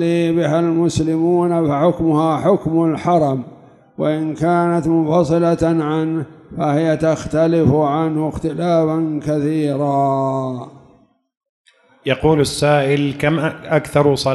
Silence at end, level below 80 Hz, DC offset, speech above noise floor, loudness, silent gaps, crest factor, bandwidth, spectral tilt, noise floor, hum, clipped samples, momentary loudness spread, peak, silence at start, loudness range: 0 s; -44 dBFS; under 0.1%; 37 dB; -17 LUFS; 11.37-11.41 s, 11.49-11.65 s; 16 dB; 12 kHz; -7 dB/octave; -53 dBFS; none; under 0.1%; 7 LU; -2 dBFS; 0 s; 3 LU